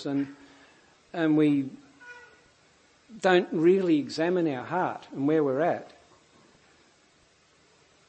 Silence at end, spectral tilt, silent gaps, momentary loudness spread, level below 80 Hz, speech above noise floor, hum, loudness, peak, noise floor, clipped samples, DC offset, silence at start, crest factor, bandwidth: 2.2 s; -7 dB/octave; none; 17 LU; -76 dBFS; 37 dB; none; -26 LUFS; -8 dBFS; -62 dBFS; under 0.1%; under 0.1%; 0 s; 20 dB; 8.6 kHz